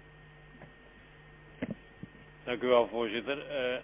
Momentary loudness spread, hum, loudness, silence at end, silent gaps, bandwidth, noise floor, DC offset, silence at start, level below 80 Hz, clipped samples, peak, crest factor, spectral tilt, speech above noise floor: 27 LU; none; -32 LUFS; 0 s; none; 3.8 kHz; -56 dBFS; under 0.1%; 0.05 s; -62 dBFS; under 0.1%; -14 dBFS; 22 dB; -3 dB/octave; 25 dB